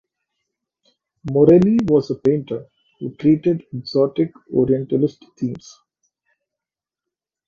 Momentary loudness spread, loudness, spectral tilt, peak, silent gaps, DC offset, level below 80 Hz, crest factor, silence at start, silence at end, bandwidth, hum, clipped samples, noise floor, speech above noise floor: 17 LU; -18 LUFS; -9 dB/octave; 0 dBFS; none; under 0.1%; -54 dBFS; 20 dB; 1.25 s; 1.9 s; 7.2 kHz; none; under 0.1%; -89 dBFS; 71 dB